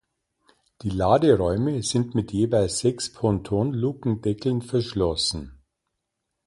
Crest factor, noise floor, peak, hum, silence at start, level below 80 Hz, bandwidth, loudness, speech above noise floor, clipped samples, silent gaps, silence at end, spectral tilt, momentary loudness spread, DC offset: 18 dB; -80 dBFS; -6 dBFS; none; 0.85 s; -44 dBFS; 11.5 kHz; -24 LUFS; 58 dB; under 0.1%; none; 0.9 s; -6 dB/octave; 7 LU; under 0.1%